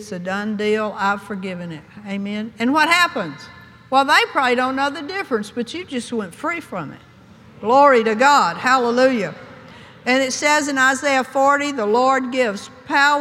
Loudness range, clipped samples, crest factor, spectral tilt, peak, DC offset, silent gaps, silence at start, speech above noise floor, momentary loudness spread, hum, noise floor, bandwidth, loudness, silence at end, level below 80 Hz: 4 LU; under 0.1%; 18 dB; -3.5 dB/octave; 0 dBFS; under 0.1%; none; 0 s; 27 dB; 15 LU; none; -45 dBFS; 15.5 kHz; -18 LUFS; 0 s; -62 dBFS